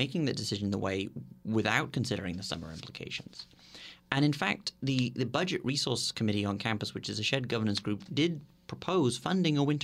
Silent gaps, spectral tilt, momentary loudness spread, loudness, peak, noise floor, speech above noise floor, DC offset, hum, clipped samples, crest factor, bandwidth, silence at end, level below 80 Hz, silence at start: none; -5 dB/octave; 14 LU; -32 LUFS; -10 dBFS; -51 dBFS; 20 dB; under 0.1%; none; under 0.1%; 22 dB; 15 kHz; 0 s; -64 dBFS; 0 s